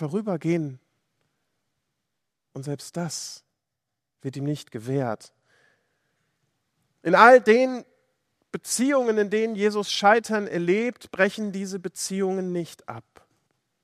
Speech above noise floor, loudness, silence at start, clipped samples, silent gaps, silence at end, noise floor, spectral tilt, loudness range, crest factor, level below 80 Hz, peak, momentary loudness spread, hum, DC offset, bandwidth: 61 dB; -23 LUFS; 0 s; under 0.1%; none; 0.85 s; -84 dBFS; -4.5 dB/octave; 15 LU; 26 dB; -76 dBFS; 0 dBFS; 19 LU; none; under 0.1%; 15 kHz